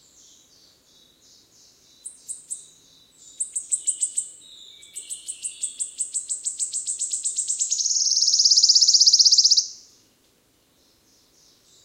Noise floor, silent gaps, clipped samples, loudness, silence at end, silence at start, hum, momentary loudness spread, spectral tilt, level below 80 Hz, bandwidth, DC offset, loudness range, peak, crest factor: -62 dBFS; none; under 0.1%; -18 LUFS; 2.1 s; 2.05 s; none; 23 LU; 5 dB/octave; -76 dBFS; 16 kHz; under 0.1%; 13 LU; -4 dBFS; 20 dB